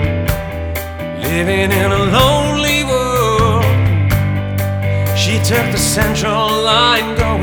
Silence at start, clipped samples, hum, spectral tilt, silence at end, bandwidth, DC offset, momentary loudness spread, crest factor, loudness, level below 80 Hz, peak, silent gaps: 0 s; under 0.1%; none; -4.5 dB/octave; 0 s; over 20 kHz; under 0.1%; 8 LU; 14 dB; -14 LUFS; -28 dBFS; 0 dBFS; none